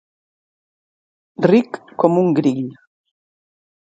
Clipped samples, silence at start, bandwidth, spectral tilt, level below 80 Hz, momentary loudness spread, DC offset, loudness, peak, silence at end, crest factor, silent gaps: under 0.1%; 1.4 s; 9 kHz; -8.5 dB/octave; -68 dBFS; 13 LU; under 0.1%; -17 LUFS; 0 dBFS; 1.15 s; 20 dB; none